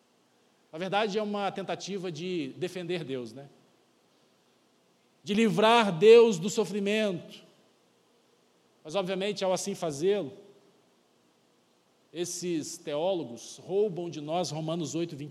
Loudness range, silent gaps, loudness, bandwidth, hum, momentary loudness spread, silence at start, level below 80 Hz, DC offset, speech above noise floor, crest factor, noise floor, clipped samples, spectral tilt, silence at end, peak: 12 LU; none; -28 LUFS; 13 kHz; none; 17 LU; 0.75 s; -78 dBFS; under 0.1%; 39 dB; 22 dB; -67 dBFS; under 0.1%; -4.5 dB/octave; 0 s; -8 dBFS